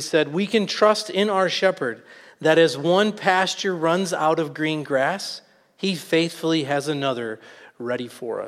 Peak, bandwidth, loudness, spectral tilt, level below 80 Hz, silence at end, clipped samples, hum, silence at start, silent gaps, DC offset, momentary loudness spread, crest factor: -4 dBFS; 15 kHz; -22 LUFS; -4.5 dB/octave; -74 dBFS; 0 s; under 0.1%; none; 0 s; none; under 0.1%; 11 LU; 18 dB